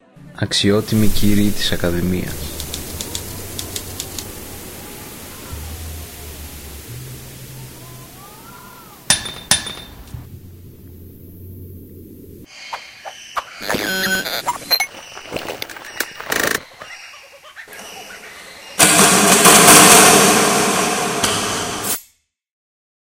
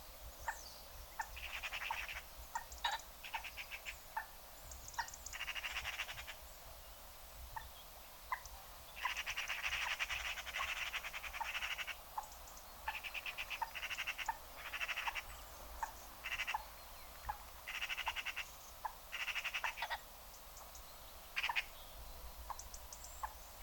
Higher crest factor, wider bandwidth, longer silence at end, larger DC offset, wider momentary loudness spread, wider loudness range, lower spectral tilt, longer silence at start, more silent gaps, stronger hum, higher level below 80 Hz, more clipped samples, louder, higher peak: about the same, 18 dB vs 22 dB; second, 17 kHz vs 19 kHz; first, 1.1 s vs 0 s; neither; first, 26 LU vs 13 LU; first, 23 LU vs 5 LU; first, -2 dB/octave vs -0.5 dB/octave; first, 0.25 s vs 0 s; neither; neither; first, -36 dBFS vs -60 dBFS; neither; first, -14 LUFS vs -44 LUFS; first, 0 dBFS vs -24 dBFS